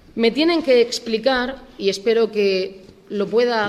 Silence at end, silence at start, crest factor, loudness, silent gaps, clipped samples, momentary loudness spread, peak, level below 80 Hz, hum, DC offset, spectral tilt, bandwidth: 0 s; 0.15 s; 14 dB; -19 LUFS; none; under 0.1%; 10 LU; -4 dBFS; -52 dBFS; none; under 0.1%; -4 dB/octave; 13 kHz